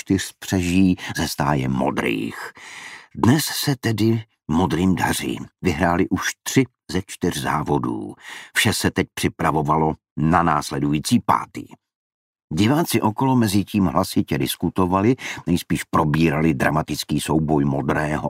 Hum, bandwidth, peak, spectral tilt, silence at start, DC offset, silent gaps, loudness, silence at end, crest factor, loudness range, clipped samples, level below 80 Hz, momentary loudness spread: none; 16 kHz; -2 dBFS; -5.5 dB/octave; 0.05 s; under 0.1%; 10.11-10.16 s, 11.95-12.33 s, 12.44-12.48 s; -21 LUFS; 0 s; 20 dB; 2 LU; under 0.1%; -44 dBFS; 8 LU